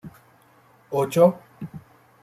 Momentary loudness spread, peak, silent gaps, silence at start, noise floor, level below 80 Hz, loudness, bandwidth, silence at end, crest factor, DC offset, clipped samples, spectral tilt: 21 LU; -4 dBFS; none; 0.05 s; -56 dBFS; -64 dBFS; -21 LUFS; 14.5 kHz; 0.45 s; 22 dB; under 0.1%; under 0.1%; -7 dB/octave